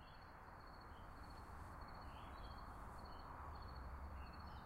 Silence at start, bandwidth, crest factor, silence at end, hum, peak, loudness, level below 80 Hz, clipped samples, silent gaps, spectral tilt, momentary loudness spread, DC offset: 0 s; 16 kHz; 12 dB; 0 s; none; -42 dBFS; -56 LUFS; -58 dBFS; under 0.1%; none; -6 dB/octave; 5 LU; under 0.1%